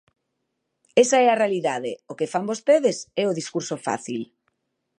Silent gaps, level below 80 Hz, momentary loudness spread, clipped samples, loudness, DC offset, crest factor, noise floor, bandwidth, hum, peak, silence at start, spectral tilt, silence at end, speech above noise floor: none; -76 dBFS; 13 LU; under 0.1%; -23 LUFS; under 0.1%; 20 dB; -77 dBFS; 11 kHz; none; -4 dBFS; 0.95 s; -4 dB/octave; 0.75 s; 55 dB